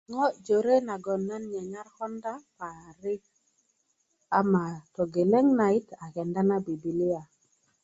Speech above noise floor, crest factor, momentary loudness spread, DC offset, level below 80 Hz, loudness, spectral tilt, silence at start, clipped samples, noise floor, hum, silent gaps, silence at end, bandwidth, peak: 46 dB; 18 dB; 16 LU; under 0.1%; -70 dBFS; -28 LUFS; -8 dB/octave; 0.1 s; under 0.1%; -74 dBFS; none; none; 0.6 s; 8 kHz; -10 dBFS